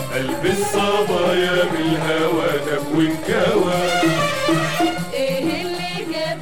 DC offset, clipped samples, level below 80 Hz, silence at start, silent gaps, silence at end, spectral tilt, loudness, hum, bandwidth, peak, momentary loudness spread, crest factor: 2%; under 0.1%; -48 dBFS; 0 s; none; 0 s; -4.5 dB/octave; -19 LUFS; none; 18 kHz; -4 dBFS; 6 LU; 14 dB